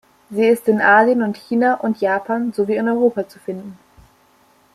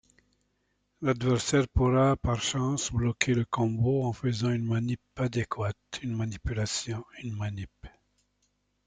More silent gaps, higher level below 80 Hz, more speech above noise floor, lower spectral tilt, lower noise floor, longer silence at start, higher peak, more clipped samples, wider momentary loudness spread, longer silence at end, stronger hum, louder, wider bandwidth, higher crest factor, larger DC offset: neither; second, -62 dBFS vs -46 dBFS; second, 38 dB vs 47 dB; about the same, -6.5 dB/octave vs -5.5 dB/octave; second, -55 dBFS vs -75 dBFS; second, 0.3 s vs 1 s; first, -2 dBFS vs -8 dBFS; neither; first, 16 LU vs 10 LU; about the same, 1 s vs 1 s; second, none vs 50 Hz at -55 dBFS; first, -17 LUFS vs -29 LUFS; first, 14 kHz vs 9.6 kHz; second, 16 dB vs 22 dB; neither